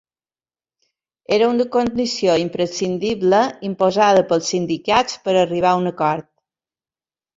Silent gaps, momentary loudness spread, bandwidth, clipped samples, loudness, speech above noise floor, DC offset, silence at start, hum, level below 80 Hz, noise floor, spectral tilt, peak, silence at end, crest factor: none; 6 LU; 7.8 kHz; under 0.1%; -18 LUFS; over 73 dB; under 0.1%; 1.3 s; none; -56 dBFS; under -90 dBFS; -4.5 dB/octave; -2 dBFS; 1.15 s; 18 dB